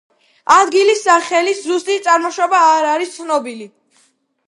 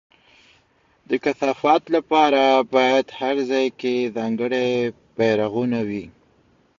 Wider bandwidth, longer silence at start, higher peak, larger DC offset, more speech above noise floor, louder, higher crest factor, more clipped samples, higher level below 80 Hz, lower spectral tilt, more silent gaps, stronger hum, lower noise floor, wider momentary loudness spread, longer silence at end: first, 11.5 kHz vs 7.4 kHz; second, 0.5 s vs 1.1 s; first, 0 dBFS vs -4 dBFS; neither; about the same, 44 dB vs 41 dB; first, -14 LUFS vs -20 LUFS; about the same, 16 dB vs 18 dB; neither; second, -68 dBFS vs -62 dBFS; second, -1 dB/octave vs -5.5 dB/octave; neither; neither; about the same, -58 dBFS vs -61 dBFS; about the same, 9 LU vs 8 LU; about the same, 0.8 s vs 0.7 s